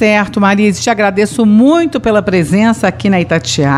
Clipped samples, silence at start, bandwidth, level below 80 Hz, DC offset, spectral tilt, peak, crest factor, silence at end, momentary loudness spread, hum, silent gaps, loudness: under 0.1%; 0 s; 12.5 kHz; -40 dBFS; under 0.1%; -5.5 dB/octave; 0 dBFS; 10 dB; 0 s; 4 LU; none; none; -11 LUFS